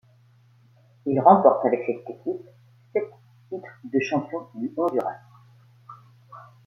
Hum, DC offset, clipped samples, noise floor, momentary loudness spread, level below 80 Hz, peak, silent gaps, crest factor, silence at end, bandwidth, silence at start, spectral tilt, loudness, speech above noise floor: none; under 0.1%; under 0.1%; -57 dBFS; 21 LU; -72 dBFS; -2 dBFS; none; 24 dB; 0.3 s; 6.2 kHz; 1.05 s; -8 dB/octave; -23 LUFS; 34 dB